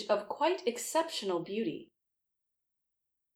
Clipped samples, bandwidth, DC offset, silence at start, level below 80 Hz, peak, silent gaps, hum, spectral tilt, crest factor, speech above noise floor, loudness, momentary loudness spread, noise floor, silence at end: under 0.1%; over 20 kHz; under 0.1%; 0 s; -84 dBFS; -16 dBFS; none; none; -3 dB/octave; 20 dB; 49 dB; -33 LUFS; 6 LU; -82 dBFS; 1.5 s